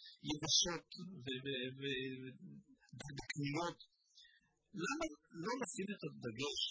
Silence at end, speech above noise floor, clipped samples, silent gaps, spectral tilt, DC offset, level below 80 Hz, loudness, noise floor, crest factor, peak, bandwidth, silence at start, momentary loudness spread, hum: 0 s; 29 dB; under 0.1%; none; -3 dB/octave; under 0.1%; -72 dBFS; -41 LUFS; -72 dBFS; 22 dB; -22 dBFS; 8 kHz; 0 s; 20 LU; none